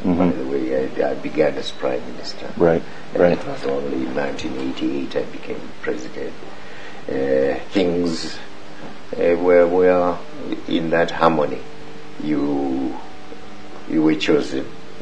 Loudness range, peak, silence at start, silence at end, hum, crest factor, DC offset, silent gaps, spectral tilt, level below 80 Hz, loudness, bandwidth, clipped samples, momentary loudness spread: 6 LU; 0 dBFS; 0 s; 0 s; none; 22 dB; 4%; none; -6 dB/octave; -50 dBFS; -21 LUFS; 9.6 kHz; under 0.1%; 20 LU